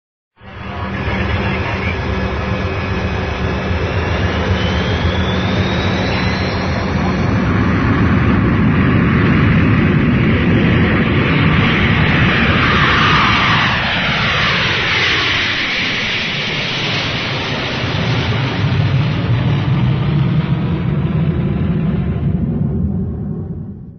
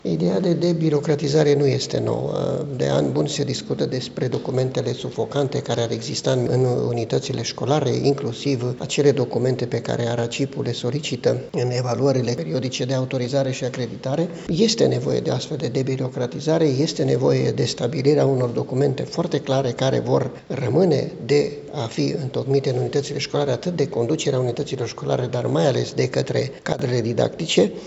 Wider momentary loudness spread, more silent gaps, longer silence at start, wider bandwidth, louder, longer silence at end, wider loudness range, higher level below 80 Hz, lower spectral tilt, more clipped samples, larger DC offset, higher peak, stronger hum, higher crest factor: about the same, 7 LU vs 6 LU; neither; first, 0.45 s vs 0.05 s; second, 6.6 kHz vs 8.2 kHz; first, -15 LUFS vs -22 LUFS; about the same, 0 s vs 0 s; first, 6 LU vs 2 LU; first, -28 dBFS vs -56 dBFS; about the same, -6.5 dB/octave vs -6 dB/octave; neither; neither; first, 0 dBFS vs -4 dBFS; neither; about the same, 14 dB vs 18 dB